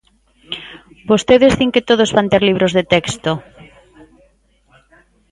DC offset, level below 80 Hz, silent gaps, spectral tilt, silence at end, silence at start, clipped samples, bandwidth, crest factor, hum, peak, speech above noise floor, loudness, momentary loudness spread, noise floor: under 0.1%; -44 dBFS; none; -5 dB/octave; 1.9 s; 0.5 s; under 0.1%; 11.5 kHz; 16 dB; none; 0 dBFS; 42 dB; -14 LUFS; 17 LU; -56 dBFS